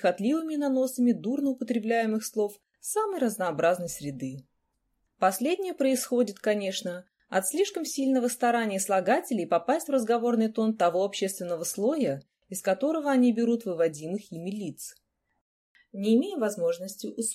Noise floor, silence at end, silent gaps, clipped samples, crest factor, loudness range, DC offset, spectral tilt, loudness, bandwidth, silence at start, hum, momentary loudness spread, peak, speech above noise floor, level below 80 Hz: -76 dBFS; 0 s; 15.41-15.75 s; under 0.1%; 16 dB; 4 LU; under 0.1%; -4.5 dB/octave; -28 LUFS; 16 kHz; 0 s; none; 11 LU; -12 dBFS; 49 dB; -74 dBFS